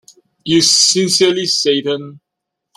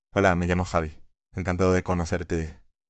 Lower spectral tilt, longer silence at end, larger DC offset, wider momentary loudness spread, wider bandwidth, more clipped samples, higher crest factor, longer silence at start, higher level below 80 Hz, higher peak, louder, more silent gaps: second, -2.5 dB/octave vs -6.5 dB/octave; first, 0.6 s vs 0.35 s; neither; about the same, 13 LU vs 14 LU; first, 15.5 kHz vs 8.6 kHz; neither; second, 16 dB vs 22 dB; first, 0.45 s vs 0.15 s; second, -60 dBFS vs -46 dBFS; first, 0 dBFS vs -4 dBFS; first, -12 LUFS vs -25 LUFS; neither